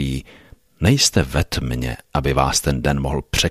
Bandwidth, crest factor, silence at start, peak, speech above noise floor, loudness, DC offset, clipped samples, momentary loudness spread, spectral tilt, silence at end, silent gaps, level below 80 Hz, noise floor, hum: 15.5 kHz; 18 dB; 0 s; -2 dBFS; 28 dB; -19 LUFS; under 0.1%; under 0.1%; 10 LU; -4 dB/octave; 0 s; none; -30 dBFS; -47 dBFS; none